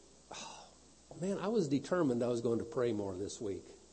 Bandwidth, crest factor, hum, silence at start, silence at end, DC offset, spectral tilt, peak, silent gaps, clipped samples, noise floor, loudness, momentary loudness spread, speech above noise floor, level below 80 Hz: 8.4 kHz; 16 dB; none; 0.3 s; 0.15 s; under 0.1%; -6 dB/octave; -20 dBFS; none; under 0.1%; -60 dBFS; -36 LUFS; 16 LU; 25 dB; -70 dBFS